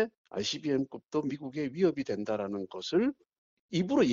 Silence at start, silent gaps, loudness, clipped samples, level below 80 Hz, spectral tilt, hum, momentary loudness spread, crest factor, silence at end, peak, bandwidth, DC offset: 0 s; 0.17-0.25 s, 3.38-3.69 s; -32 LUFS; under 0.1%; -68 dBFS; -5 dB/octave; none; 7 LU; 16 dB; 0 s; -14 dBFS; 7.6 kHz; under 0.1%